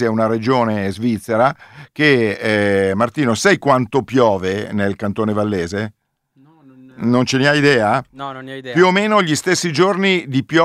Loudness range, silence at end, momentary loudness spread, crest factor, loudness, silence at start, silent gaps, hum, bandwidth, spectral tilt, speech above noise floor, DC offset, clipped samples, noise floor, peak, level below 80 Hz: 4 LU; 0 s; 9 LU; 16 dB; -16 LUFS; 0 s; none; none; 15 kHz; -5 dB/octave; 38 dB; under 0.1%; under 0.1%; -54 dBFS; 0 dBFS; -56 dBFS